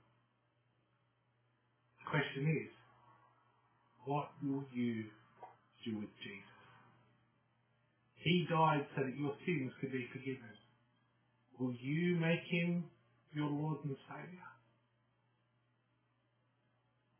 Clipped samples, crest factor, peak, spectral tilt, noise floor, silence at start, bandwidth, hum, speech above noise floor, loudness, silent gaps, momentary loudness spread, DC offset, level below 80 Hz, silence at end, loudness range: under 0.1%; 22 dB; -20 dBFS; -5.5 dB/octave; -79 dBFS; 2 s; 3.5 kHz; none; 40 dB; -39 LUFS; none; 19 LU; under 0.1%; -82 dBFS; 2.65 s; 9 LU